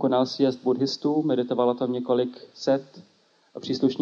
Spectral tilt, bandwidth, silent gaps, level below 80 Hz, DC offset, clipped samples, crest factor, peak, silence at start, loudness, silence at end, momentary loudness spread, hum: -6.5 dB/octave; 7.4 kHz; none; -74 dBFS; under 0.1%; under 0.1%; 16 dB; -8 dBFS; 0 s; -25 LUFS; 0 s; 8 LU; none